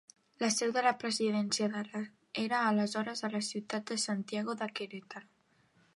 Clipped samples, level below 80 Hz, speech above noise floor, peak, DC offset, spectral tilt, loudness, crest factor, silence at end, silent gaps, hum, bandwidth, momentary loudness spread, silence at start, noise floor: under 0.1%; -84 dBFS; 35 dB; -14 dBFS; under 0.1%; -3.5 dB/octave; -34 LUFS; 20 dB; 0.75 s; none; none; 11.5 kHz; 12 LU; 0.4 s; -69 dBFS